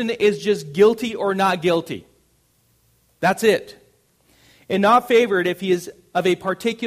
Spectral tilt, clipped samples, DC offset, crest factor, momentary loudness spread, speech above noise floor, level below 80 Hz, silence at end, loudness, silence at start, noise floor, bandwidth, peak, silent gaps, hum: -5 dB/octave; under 0.1%; under 0.1%; 18 dB; 8 LU; 43 dB; -62 dBFS; 0 s; -19 LUFS; 0 s; -62 dBFS; 15.5 kHz; -2 dBFS; none; none